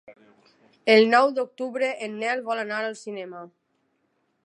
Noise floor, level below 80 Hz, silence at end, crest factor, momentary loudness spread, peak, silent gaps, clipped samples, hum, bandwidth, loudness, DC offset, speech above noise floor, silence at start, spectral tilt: -72 dBFS; -86 dBFS; 0.95 s; 22 dB; 19 LU; -2 dBFS; none; under 0.1%; none; 11 kHz; -23 LUFS; under 0.1%; 48 dB; 0.1 s; -4 dB/octave